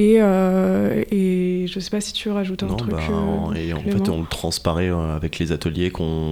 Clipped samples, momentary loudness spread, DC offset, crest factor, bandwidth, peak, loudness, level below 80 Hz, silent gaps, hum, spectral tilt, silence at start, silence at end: under 0.1%; 7 LU; under 0.1%; 16 dB; 15.5 kHz; -4 dBFS; -21 LUFS; -36 dBFS; none; none; -6.5 dB/octave; 0 s; 0 s